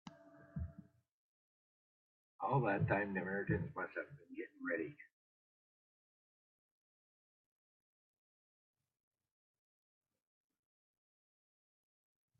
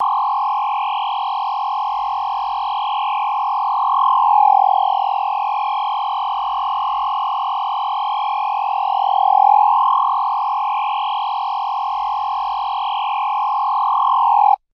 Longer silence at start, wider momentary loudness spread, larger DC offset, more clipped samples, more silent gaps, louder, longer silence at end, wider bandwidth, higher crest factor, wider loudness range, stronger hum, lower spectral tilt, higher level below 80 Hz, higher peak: about the same, 0.05 s vs 0 s; first, 15 LU vs 8 LU; neither; neither; first, 1.11-2.39 s vs none; second, -41 LUFS vs -18 LUFS; first, 7.35 s vs 0.2 s; second, 5 kHz vs 5.8 kHz; first, 24 dB vs 14 dB; first, 10 LU vs 4 LU; neither; first, -7.5 dB/octave vs -0.5 dB/octave; second, -70 dBFS vs -62 dBFS; second, -22 dBFS vs -4 dBFS